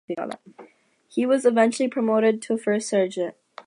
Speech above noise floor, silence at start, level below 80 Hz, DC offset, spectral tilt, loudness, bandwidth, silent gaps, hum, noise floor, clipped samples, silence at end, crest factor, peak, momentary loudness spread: 33 dB; 0.1 s; -80 dBFS; under 0.1%; -5 dB/octave; -23 LUFS; 11.5 kHz; none; none; -55 dBFS; under 0.1%; 0.05 s; 18 dB; -6 dBFS; 12 LU